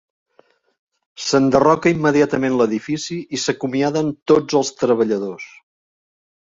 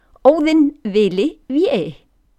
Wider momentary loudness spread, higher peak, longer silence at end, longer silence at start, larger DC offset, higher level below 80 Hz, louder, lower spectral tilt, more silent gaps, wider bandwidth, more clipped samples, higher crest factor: first, 11 LU vs 7 LU; about the same, -2 dBFS vs 0 dBFS; first, 1.05 s vs 0.45 s; first, 1.2 s vs 0.25 s; neither; second, -56 dBFS vs -50 dBFS; about the same, -18 LUFS vs -16 LUFS; second, -5 dB/octave vs -6.5 dB/octave; first, 4.22-4.26 s vs none; second, 8 kHz vs 9 kHz; neither; about the same, 18 dB vs 16 dB